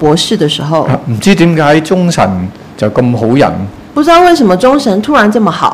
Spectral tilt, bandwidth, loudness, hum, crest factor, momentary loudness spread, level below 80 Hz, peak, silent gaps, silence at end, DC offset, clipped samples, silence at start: -5.5 dB/octave; 15 kHz; -9 LUFS; none; 8 dB; 7 LU; -38 dBFS; 0 dBFS; none; 0 s; under 0.1%; 2%; 0 s